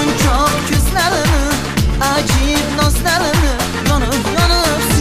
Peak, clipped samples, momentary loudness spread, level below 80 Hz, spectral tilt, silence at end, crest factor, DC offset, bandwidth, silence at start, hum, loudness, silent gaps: -2 dBFS; under 0.1%; 3 LU; -20 dBFS; -4 dB/octave; 0 s; 12 dB; under 0.1%; 15.5 kHz; 0 s; none; -14 LUFS; none